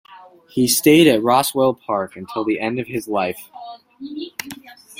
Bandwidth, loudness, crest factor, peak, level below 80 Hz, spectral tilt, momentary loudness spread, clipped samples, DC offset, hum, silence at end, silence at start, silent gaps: 16.5 kHz; -18 LUFS; 18 dB; -2 dBFS; -60 dBFS; -4 dB/octave; 24 LU; under 0.1%; under 0.1%; none; 0.25 s; 0.1 s; none